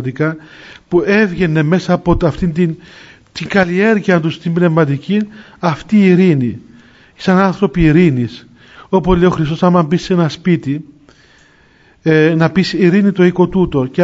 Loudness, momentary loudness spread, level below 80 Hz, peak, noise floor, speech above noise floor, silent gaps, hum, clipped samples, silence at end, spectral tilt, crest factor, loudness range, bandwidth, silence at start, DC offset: -13 LUFS; 9 LU; -34 dBFS; 0 dBFS; -48 dBFS; 36 dB; none; none; under 0.1%; 0 s; -7.5 dB/octave; 14 dB; 2 LU; 7.8 kHz; 0 s; under 0.1%